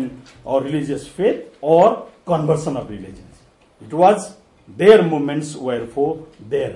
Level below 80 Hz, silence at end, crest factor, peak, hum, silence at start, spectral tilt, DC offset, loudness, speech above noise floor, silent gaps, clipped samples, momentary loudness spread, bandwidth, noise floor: -54 dBFS; 0 s; 18 dB; 0 dBFS; none; 0 s; -6.5 dB/octave; under 0.1%; -18 LUFS; 33 dB; none; under 0.1%; 18 LU; 11.5 kHz; -51 dBFS